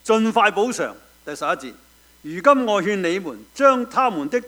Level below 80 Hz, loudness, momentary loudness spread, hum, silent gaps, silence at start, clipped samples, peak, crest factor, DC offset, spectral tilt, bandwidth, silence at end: -60 dBFS; -20 LUFS; 18 LU; none; none; 0.05 s; under 0.1%; 0 dBFS; 20 dB; under 0.1%; -4.5 dB/octave; over 20 kHz; 0 s